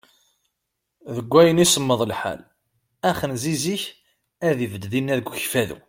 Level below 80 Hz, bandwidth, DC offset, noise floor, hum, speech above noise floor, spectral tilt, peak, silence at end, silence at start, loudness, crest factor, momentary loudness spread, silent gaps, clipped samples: -56 dBFS; 16.5 kHz; under 0.1%; -79 dBFS; none; 58 dB; -4 dB/octave; -2 dBFS; 0.1 s; 1.05 s; -21 LUFS; 22 dB; 15 LU; none; under 0.1%